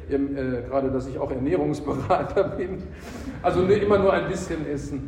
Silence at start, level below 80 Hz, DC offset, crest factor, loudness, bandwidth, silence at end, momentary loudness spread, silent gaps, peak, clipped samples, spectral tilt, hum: 0 s; -42 dBFS; under 0.1%; 16 dB; -24 LUFS; 11.5 kHz; 0 s; 12 LU; none; -8 dBFS; under 0.1%; -7 dB/octave; none